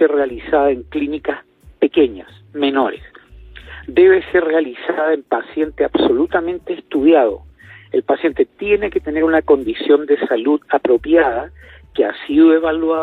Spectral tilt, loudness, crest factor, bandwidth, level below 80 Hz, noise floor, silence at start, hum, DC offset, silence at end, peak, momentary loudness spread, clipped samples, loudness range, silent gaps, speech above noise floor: -7.5 dB/octave; -16 LUFS; 14 dB; 4.4 kHz; -44 dBFS; -39 dBFS; 0 s; none; under 0.1%; 0 s; -2 dBFS; 12 LU; under 0.1%; 3 LU; none; 24 dB